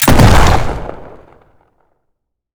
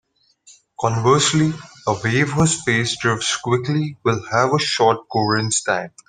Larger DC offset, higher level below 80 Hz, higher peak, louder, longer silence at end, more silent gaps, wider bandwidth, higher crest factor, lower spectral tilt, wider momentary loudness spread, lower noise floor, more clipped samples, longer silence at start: neither; first, -18 dBFS vs -52 dBFS; about the same, 0 dBFS vs -2 dBFS; first, -10 LUFS vs -19 LUFS; first, 1.45 s vs 0.2 s; neither; first, over 20 kHz vs 10 kHz; second, 12 dB vs 18 dB; about the same, -5 dB/octave vs -4 dB/octave; first, 22 LU vs 7 LU; first, -68 dBFS vs -52 dBFS; neither; second, 0 s vs 0.8 s